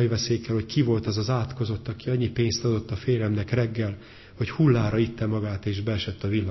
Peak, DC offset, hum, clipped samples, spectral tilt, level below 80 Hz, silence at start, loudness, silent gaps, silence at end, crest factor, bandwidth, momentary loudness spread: -8 dBFS; under 0.1%; none; under 0.1%; -6.5 dB/octave; -44 dBFS; 0 s; -26 LUFS; none; 0 s; 16 dB; 6.2 kHz; 7 LU